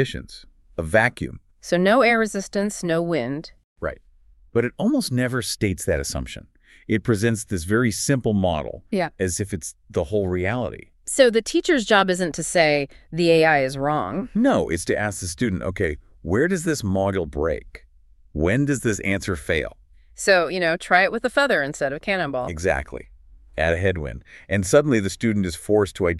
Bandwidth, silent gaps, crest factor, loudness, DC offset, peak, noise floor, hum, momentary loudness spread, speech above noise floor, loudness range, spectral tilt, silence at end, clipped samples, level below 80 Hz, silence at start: 13.5 kHz; 3.64-3.76 s; 20 dB; -22 LUFS; under 0.1%; -2 dBFS; -53 dBFS; none; 14 LU; 31 dB; 5 LU; -5 dB/octave; 0 s; under 0.1%; -42 dBFS; 0 s